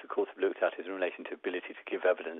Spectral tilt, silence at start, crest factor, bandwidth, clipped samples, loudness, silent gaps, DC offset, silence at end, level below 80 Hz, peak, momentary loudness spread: -1 dB/octave; 0 s; 18 dB; 3.9 kHz; under 0.1%; -34 LUFS; none; under 0.1%; 0 s; -90 dBFS; -14 dBFS; 8 LU